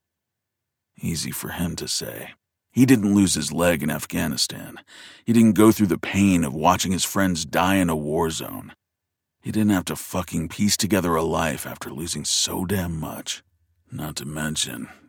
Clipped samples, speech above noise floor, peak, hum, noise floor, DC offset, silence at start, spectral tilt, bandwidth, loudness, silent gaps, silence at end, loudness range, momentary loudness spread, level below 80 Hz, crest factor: under 0.1%; 60 dB; -4 dBFS; none; -83 dBFS; under 0.1%; 1 s; -4.5 dB/octave; 19 kHz; -22 LUFS; none; 0.15 s; 5 LU; 16 LU; -48 dBFS; 20 dB